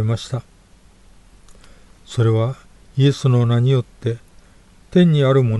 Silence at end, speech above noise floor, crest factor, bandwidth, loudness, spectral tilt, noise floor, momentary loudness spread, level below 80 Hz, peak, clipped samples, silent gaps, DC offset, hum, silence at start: 0 s; 33 dB; 16 dB; 11 kHz; -18 LUFS; -8 dB/octave; -49 dBFS; 14 LU; -48 dBFS; -4 dBFS; under 0.1%; none; under 0.1%; 50 Hz at -50 dBFS; 0 s